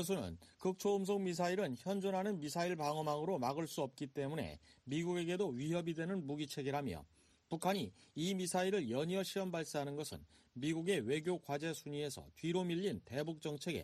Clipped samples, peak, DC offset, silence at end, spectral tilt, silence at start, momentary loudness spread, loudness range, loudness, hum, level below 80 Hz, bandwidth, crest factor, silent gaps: under 0.1%; -22 dBFS; under 0.1%; 0 s; -5.5 dB/octave; 0 s; 7 LU; 2 LU; -40 LUFS; none; -70 dBFS; 13.5 kHz; 18 dB; none